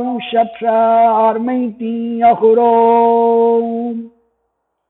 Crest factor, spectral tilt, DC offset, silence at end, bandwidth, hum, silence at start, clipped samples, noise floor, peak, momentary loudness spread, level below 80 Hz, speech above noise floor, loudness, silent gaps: 12 dB; -10.5 dB/octave; under 0.1%; 0.8 s; 4 kHz; none; 0 s; under 0.1%; -69 dBFS; -2 dBFS; 10 LU; -60 dBFS; 57 dB; -13 LUFS; none